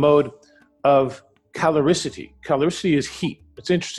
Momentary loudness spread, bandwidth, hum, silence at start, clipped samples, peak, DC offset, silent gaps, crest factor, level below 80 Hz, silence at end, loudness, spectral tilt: 13 LU; 12 kHz; none; 0 s; under 0.1%; -6 dBFS; under 0.1%; none; 16 dB; -54 dBFS; 0 s; -21 LUFS; -5.5 dB/octave